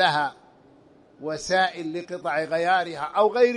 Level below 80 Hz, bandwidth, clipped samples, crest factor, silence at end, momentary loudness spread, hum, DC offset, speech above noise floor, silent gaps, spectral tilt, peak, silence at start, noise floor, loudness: -64 dBFS; 11 kHz; under 0.1%; 18 dB; 0 s; 10 LU; none; under 0.1%; 31 dB; none; -3.5 dB/octave; -6 dBFS; 0 s; -54 dBFS; -25 LUFS